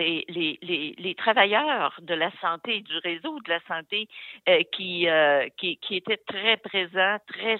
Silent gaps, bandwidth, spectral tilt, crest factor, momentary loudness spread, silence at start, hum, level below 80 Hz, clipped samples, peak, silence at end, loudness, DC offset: none; 4.4 kHz; -6 dB/octave; 20 dB; 9 LU; 0 s; none; -84 dBFS; under 0.1%; -6 dBFS; 0 s; -25 LUFS; under 0.1%